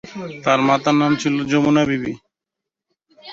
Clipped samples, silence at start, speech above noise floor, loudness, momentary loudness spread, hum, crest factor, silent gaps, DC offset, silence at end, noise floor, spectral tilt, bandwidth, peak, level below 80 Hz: under 0.1%; 0.05 s; 67 dB; -17 LUFS; 13 LU; none; 18 dB; none; under 0.1%; 0 s; -84 dBFS; -5.5 dB/octave; 7.8 kHz; -2 dBFS; -56 dBFS